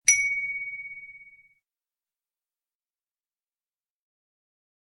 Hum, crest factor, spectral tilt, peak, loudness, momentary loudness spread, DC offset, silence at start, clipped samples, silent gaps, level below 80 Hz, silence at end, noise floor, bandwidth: none; 30 dB; 4 dB/octave; -4 dBFS; -25 LUFS; 24 LU; under 0.1%; 0.05 s; under 0.1%; none; -72 dBFS; 3.7 s; under -90 dBFS; 14.5 kHz